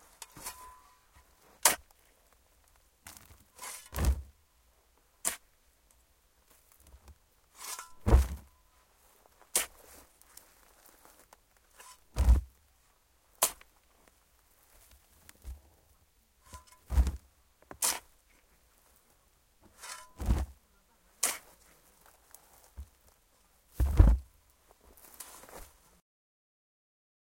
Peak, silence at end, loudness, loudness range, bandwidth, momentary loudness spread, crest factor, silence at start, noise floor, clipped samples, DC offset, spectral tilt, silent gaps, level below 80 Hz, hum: -4 dBFS; 1.65 s; -32 LUFS; 7 LU; 17 kHz; 28 LU; 32 dB; 0.35 s; -68 dBFS; under 0.1%; under 0.1%; -3.5 dB/octave; none; -38 dBFS; none